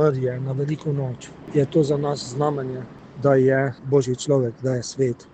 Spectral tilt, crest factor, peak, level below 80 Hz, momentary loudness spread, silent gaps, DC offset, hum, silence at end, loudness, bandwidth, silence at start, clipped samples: -6.5 dB/octave; 18 dB; -4 dBFS; -56 dBFS; 10 LU; none; under 0.1%; none; 0.1 s; -22 LUFS; 9 kHz; 0 s; under 0.1%